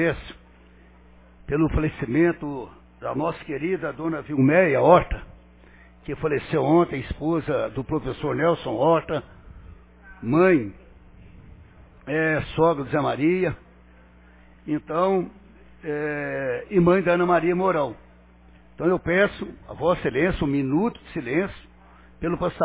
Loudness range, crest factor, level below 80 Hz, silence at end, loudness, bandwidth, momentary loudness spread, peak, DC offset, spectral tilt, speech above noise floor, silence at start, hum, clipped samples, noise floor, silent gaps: 5 LU; 22 dB; -44 dBFS; 0 s; -23 LUFS; 4 kHz; 15 LU; -2 dBFS; under 0.1%; -11 dB/octave; 29 dB; 0 s; 60 Hz at -50 dBFS; under 0.1%; -51 dBFS; none